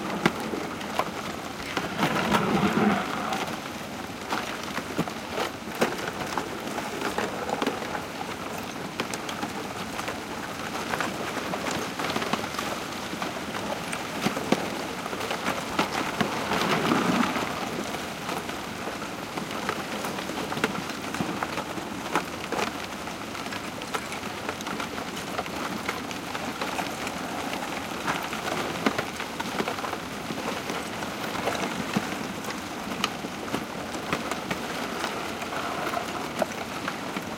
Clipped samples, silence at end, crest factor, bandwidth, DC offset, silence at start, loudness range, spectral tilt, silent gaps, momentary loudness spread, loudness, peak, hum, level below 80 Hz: under 0.1%; 0 s; 24 dB; 17 kHz; under 0.1%; 0 s; 5 LU; -4 dB/octave; none; 7 LU; -30 LUFS; -6 dBFS; none; -56 dBFS